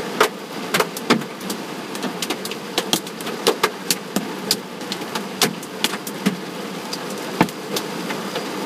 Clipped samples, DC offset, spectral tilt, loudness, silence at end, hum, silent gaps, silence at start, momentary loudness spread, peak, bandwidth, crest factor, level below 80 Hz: under 0.1%; under 0.1%; -3 dB/octave; -23 LUFS; 0 s; none; none; 0 s; 8 LU; 0 dBFS; 16 kHz; 24 dB; -64 dBFS